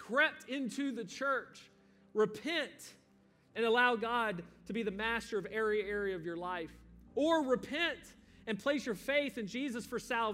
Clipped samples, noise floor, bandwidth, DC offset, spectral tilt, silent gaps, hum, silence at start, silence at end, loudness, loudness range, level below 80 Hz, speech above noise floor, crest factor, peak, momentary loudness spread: under 0.1%; -67 dBFS; 16 kHz; under 0.1%; -4 dB/octave; none; none; 0 s; 0 s; -35 LUFS; 3 LU; -66 dBFS; 32 dB; 20 dB; -16 dBFS; 12 LU